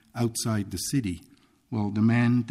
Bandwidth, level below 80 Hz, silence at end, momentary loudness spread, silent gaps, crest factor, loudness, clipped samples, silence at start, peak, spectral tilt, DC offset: 15.5 kHz; -56 dBFS; 0 s; 12 LU; none; 14 dB; -27 LUFS; under 0.1%; 0.15 s; -12 dBFS; -5.5 dB/octave; under 0.1%